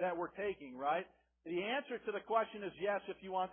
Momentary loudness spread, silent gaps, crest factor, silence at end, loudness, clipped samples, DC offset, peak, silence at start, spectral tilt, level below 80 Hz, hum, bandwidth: 6 LU; none; 18 dB; 0 s; -40 LUFS; under 0.1%; under 0.1%; -20 dBFS; 0 s; 0 dB/octave; -76 dBFS; none; 3.5 kHz